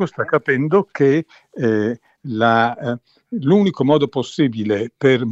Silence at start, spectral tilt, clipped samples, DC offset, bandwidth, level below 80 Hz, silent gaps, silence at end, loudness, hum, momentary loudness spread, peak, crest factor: 0 s; -7.5 dB/octave; under 0.1%; under 0.1%; 8 kHz; -64 dBFS; none; 0 s; -18 LUFS; none; 11 LU; -2 dBFS; 16 dB